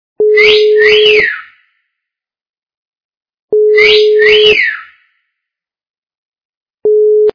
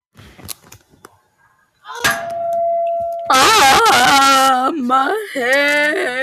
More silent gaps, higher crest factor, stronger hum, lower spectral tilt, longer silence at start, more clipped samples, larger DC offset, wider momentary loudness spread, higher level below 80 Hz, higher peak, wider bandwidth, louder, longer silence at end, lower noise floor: first, 2.49-2.62 s, 2.77-3.09 s, 3.17-3.21 s, 3.39-3.48 s, 5.90-6.02 s, 6.18-6.32 s, 6.45-6.66 s, 6.74-6.78 s vs none; about the same, 10 dB vs 12 dB; neither; about the same, -2.5 dB/octave vs -1.5 dB/octave; second, 0.2 s vs 0.45 s; first, 0.8% vs under 0.1%; neither; second, 10 LU vs 17 LU; about the same, -48 dBFS vs -50 dBFS; first, 0 dBFS vs -4 dBFS; second, 5.4 kHz vs 16 kHz; first, -7 LUFS vs -13 LUFS; about the same, 0.05 s vs 0 s; first, -82 dBFS vs -57 dBFS